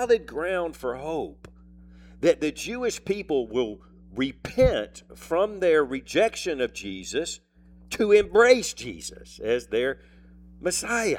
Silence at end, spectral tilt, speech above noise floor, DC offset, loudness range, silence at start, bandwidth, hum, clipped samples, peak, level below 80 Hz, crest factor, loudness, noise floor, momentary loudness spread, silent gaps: 0 s; -4 dB/octave; 25 dB; under 0.1%; 5 LU; 0 s; 16.5 kHz; none; under 0.1%; -4 dBFS; -46 dBFS; 22 dB; -25 LUFS; -49 dBFS; 16 LU; none